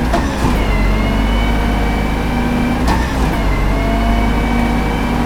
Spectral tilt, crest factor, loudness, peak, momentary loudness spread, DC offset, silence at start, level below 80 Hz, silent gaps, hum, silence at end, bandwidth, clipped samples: -6 dB/octave; 14 dB; -16 LUFS; 0 dBFS; 1 LU; under 0.1%; 0 s; -18 dBFS; none; none; 0 s; 16 kHz; under 0.1%